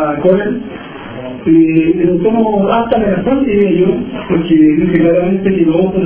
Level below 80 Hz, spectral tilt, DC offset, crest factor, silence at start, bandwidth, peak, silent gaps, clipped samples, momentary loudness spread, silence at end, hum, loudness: -38 dBFS; -12 dB/octave; under 0.1%; 12 dB; 0 s; 3.5 kHz; 0 dBFS; none; under 0.1%; 11 LU; 0 s; none; -11 LUFS